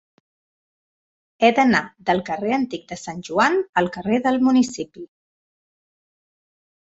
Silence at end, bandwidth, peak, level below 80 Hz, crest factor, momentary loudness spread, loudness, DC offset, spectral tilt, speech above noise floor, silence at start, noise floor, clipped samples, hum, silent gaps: 1.9 s; 8 kHz; -2 dBFS; -60 dBFS; 20 dB; 14 LU; -20 LUFS; under 0.1%; -5 dB/octave; over 70 dB; 1.4 s; under -90 dBFS; under 0.1%; none; 3.69-3.73 s